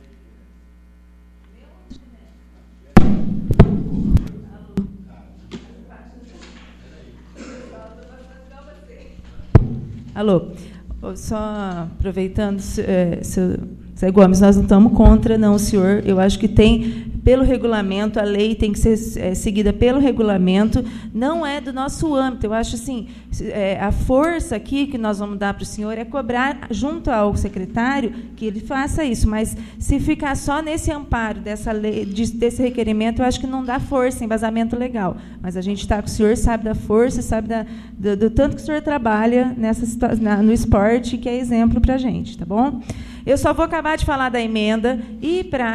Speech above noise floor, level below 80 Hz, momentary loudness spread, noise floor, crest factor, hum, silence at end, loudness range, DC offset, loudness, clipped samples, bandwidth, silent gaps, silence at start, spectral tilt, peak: 28 dB; -28 dBFS; 12 LU; -46 dBFS; 18 dB; none; 0 s; 8 LU; under 0.1%; -19 LUFS; under 0.1%; 13.5 kHz; none; 1.9 s; -6.5 dB/octave; 0 dBFS